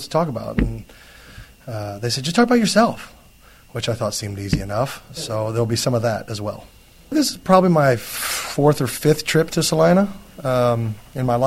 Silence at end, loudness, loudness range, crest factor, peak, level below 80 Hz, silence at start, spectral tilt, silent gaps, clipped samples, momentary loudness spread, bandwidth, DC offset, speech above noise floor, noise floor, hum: 0 s; -20 LUFS; 6 LU; 20 dB; 0 dBFS; -40 dBFS; 0 s; -5 dB/octave; none; under 0.1%; 13 LU; 16.5 kHz; under 0.1%; 29 dB; -48 dBFS; none